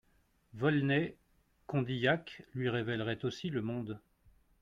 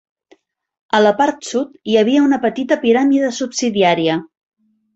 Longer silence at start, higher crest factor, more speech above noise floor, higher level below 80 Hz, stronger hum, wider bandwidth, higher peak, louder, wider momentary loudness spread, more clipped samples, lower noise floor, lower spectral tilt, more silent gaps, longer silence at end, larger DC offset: second, 0.55 s vs 0.95 s; about the same, 18 dB vs 16 dB; about the same, 37 dB vs 39 dB; second, -68 dBFS vs -60 dBFS; neither; second, 7.4 kHz vs 8.2 kHz; second, -16 dBFS vs -2 dBFS; second, -35 LUFS vs -16 LUFS; about the same, 10 LU vs 8 LU; neither; first, -72 dBFS vs -54 dBFS; first, -7 dB/octave vs -4.5 dB/octave; neither; about the same, 0.65 s vs 0.7 s; neither